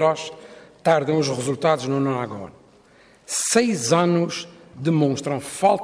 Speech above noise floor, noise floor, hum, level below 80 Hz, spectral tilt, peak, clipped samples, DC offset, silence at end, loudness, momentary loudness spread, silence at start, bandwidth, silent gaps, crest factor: 32 dB; -53 dBFS; none; -64 dBFS; -4.5 dB/octave; -4 dBFS; under 0.1%; under 0.1%; 0 s; -22 LUFS; 14 LU; 0 s; 11 kHz; none; 18 dB